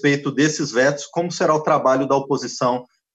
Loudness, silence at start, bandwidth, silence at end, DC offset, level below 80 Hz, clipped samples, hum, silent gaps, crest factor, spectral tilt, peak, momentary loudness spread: -19 LUFS; 0 s; 8.6 kHz; 0.3 s; under 0.1%; -66 dBFS; under 0.1%; none; none; 16 dB; -4.5 dB/octave; -4 dBFS; 7 LU